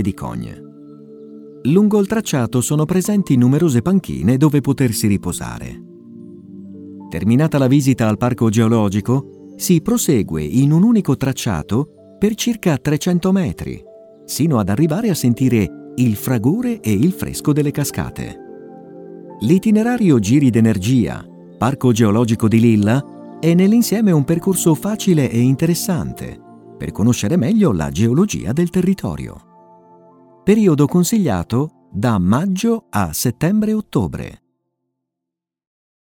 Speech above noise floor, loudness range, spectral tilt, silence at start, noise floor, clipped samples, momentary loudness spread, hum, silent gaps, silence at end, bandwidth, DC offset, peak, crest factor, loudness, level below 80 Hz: 68 dB; 4 LU; -6.5 dB/octave; 0 s; -83 dBFS; under 0.1%; 16 LU; none; none; 1.7 s; 18.5 kHz; under 0.1%; 0 dBFS; 16 dB; -16 LUFS; -44 dBFS